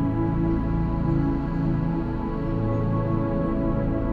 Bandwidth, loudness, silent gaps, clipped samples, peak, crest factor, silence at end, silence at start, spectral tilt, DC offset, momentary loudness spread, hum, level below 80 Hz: 4.8 kHz; -25 LUFS; none; under 0.1%; -12 dBFS; 10 dB; 0 s; 0 s; -11 dB/octave; 0.2%; 3 LU; none; -32 dBFS